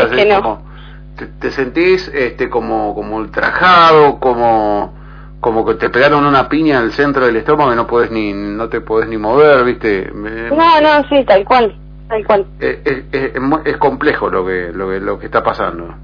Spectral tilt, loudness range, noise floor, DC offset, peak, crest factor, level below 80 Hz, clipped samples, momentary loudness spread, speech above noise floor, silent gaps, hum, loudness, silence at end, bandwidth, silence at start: -7 dB/octave; 5 LU; -32 dBFS; under 0.1%; 0 dBFS; 12 dB; -34 dBFS; under 0.1%; 11 LU; 20 dB; none; none; -13 LUFS; 0 s; 5.4 kHz; 0 s